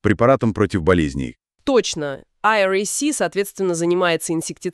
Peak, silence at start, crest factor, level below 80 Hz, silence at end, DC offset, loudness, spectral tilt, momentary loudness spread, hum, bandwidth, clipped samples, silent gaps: -2 dBFS; 0.05 s; 16 dB; -42 dBFS; 0 s; under 0.1%; -19 LUFS; -4.5 dB/octave; 9 LU; none; 13.5 kHz; under 0.1%; none